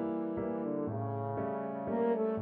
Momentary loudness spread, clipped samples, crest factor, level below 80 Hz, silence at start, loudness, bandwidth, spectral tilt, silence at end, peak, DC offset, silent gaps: 5 LU; under 0.1%; 12 dB; -66 dBFS; 0 s; -35 LUFS; 4 kHz; -9 dB/octave; 0 s; -22 dBFS; under 0.1%; none